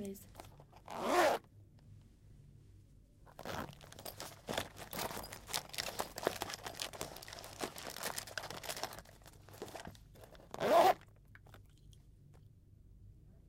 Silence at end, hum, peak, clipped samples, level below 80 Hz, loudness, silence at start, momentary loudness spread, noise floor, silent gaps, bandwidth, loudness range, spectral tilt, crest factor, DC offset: 0 s; none; -14 dBFS; under 0.1%; -64 dBFS; -39 LUFS; 0 s; 26 LU; -62 dBFS; none; 17 kHz; 9 LU; -3 dB/octave; 26 dB; under 0.1%